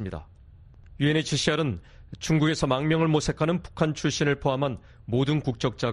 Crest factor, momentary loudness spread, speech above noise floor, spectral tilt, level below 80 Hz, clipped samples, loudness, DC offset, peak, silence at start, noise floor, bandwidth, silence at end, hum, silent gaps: 18 dB; 8 LU; 25 dB; -5.5 dB/octave; -48 dBFS; under 0.1%; -26 LUFS; under 0.1%; -8 dBFS; 0 s; -50 dBFS; 11 kHz; 0 s; none; none